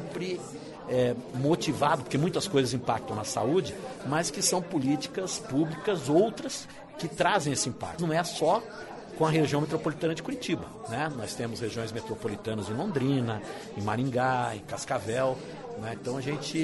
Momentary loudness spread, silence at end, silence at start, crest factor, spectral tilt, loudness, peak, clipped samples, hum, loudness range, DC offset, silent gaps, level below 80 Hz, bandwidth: 11 LU; 0 s; 0 s; 18 dB; -5 dB/octave; -30 LUFS; -12 dBFS; under 0.1%; none; 4 LU; under 0.1%; none; -60 dBFS; 11.5 kHz